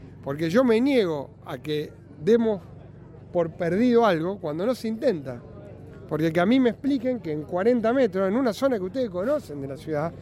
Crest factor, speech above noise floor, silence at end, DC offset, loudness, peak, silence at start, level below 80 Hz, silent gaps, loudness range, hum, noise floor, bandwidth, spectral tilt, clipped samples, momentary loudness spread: 16 dB; 21 dB; 0 s; under 0.1%; -24 LUFS; -8 dBFS; 0 s; -56 dBFS; none; 2 LU; none; -44 dBFS; 15 kHz; -7 dB/octave; under 0.1%; 14 LU